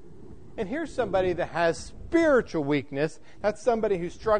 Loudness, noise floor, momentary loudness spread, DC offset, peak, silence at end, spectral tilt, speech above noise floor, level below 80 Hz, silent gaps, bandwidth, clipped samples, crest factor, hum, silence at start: -27 LUFS; -48 dBFS; 10 LU; 0.7%; -10 dBFS; 0 s; -6 dB/octave; 22 dB; -50 dBFS; none; 9.6 kHz; under 0.1%; 16 dB; none; 0.05 s